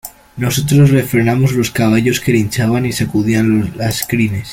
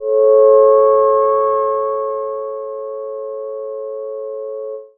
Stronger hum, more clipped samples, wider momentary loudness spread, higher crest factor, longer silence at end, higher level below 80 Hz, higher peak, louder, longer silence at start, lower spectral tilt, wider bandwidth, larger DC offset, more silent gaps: neither; neither; second, 7 LU vs 16 LU; about the same, 14 dB vs 14 dB; about the same, 0 s vs 0.1 s; first, -40 dBFS vs -76 dBFS; about the same, 0 dBFS vs -2 dBFS; about the same, -14 LUFS vs -13 LUFS; about the same, 0.05 s vs 0 s; second, -6 dB/octave vs -10 dB/octave; first, 17 kHz vs 2.3 kHz; neither; neither